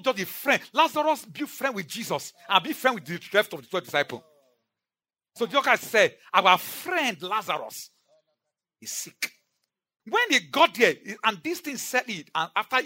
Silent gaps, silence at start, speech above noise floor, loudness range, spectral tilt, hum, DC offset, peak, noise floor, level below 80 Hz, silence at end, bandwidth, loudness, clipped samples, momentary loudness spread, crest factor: none; 0.05 s; over 64 dB; 5 LU; -2.5 dB/octave; none; under 0.1%; -2 dBFS; under -90 dBFS; -84 dBFS; 0 s; 16.5 kHz; -25 LUFS; under 0.1%; 13 LU; 24 dB